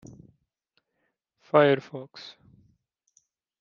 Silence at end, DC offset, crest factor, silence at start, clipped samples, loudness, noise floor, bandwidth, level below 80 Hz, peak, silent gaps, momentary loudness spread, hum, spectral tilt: 1.3 s; under 0.1%; 26 dB; 1.55 s; under 0.1%; -23 LUFS; -78 dBFS; 7.2 kHz; -72 dBFS; -4 dBFS; none; 24 LU; none; -7 dB/octave